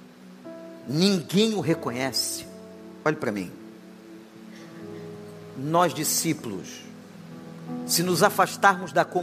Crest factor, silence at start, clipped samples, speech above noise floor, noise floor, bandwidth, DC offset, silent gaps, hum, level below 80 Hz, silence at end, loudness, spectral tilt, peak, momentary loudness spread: 24 dB; 0 s; under 0.1%; 21 dB; -45 dBFS; 15.5 kHz; under 0.1%; none; none; -72 dBFS; 0 s; -24 LUFS; -4 dB/octave; -4 dBFS; 24 LU